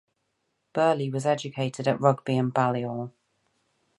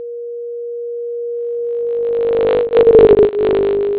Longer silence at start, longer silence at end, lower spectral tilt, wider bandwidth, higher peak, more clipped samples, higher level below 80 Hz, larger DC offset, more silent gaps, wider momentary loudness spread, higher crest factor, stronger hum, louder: first, 0.75 s vs 0 s; first, 0.9 s vs 0 s; second, -6.5 dB/octave vs -10.5 dB/octave; first, 11.5 kHz vs 4 kHz; second, -6 dBFS vs 0 dBFS; neither; second, -72 dBFS vs -40 dBFS; neither; neither; second, 10 LU vs 18 LU; first, 22 dB vs 14 dB; neither; second, -26 LUFS vs -14 LUFS